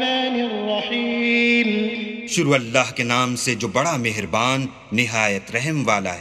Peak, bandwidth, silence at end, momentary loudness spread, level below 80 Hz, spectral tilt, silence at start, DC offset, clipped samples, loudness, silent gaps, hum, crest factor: -2 dBFS; 14 kHz; 0 s; 6 LU; -58 dBFS; -4 dB/octave; 0 s; under 0.1%; under 0.1%; -20 LUFS; none; none; 20 dB